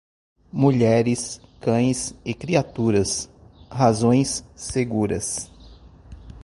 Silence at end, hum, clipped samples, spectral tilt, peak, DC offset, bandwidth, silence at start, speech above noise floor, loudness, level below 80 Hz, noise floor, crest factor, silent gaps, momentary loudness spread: 0 s; none; under 0.1%; -5.5 dB/octave; -4 dBFS; under 0.1%; 11.5 kHz; 0.55 s; 25 dB; -22 LUFS; -46 dBFS; -46 dBFS; 20 dB; none; 13 LU